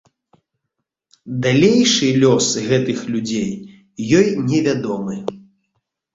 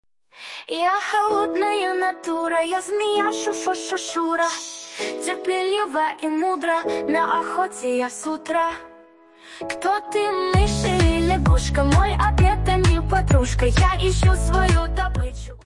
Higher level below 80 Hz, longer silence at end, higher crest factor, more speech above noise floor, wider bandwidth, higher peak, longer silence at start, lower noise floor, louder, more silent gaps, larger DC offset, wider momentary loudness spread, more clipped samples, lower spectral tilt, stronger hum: second, -54 dBFS vs -26 dBFS; first, 0.75 s vs 0.1 s; about the same, 16 dB vs 16 dB; first, 61 dB vs 29 dB; second, 8 kHz vs 11.5 kHz; first, -2 dBFS vs -6 dBFS; first, 1.25 s vs 0.35 s; first, -78 dBFS vs -49 dBFS; first, -17 LUFS vs -21 LUFS; neither; neither; first, 15 LU vs 8 LU; neither; about the same, -4.5 dB/octave vs -5.5 dB/octave; neither